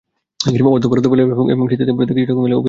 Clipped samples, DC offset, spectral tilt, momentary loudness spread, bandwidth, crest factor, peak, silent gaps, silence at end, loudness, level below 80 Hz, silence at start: under 0.1%; under 0.1%; -7 dB/octave; 3 LU; 7.6 kHz; 14 dB; -2 dBFS; none; 0 s; -15 LUFS; -50 dBFS; 0.4 s